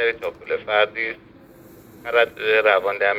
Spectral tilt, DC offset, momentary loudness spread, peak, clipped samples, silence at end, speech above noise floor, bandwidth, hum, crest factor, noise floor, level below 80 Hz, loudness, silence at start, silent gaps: -4 dB/octave; under 0.1%; 13 LU; -2 dBFS; under 0.1%; 0 s; 26 dB; 16 kHz; none; 20 dB; -46 dBFS; -60 dBFS; -20 LUFS; 0 s; none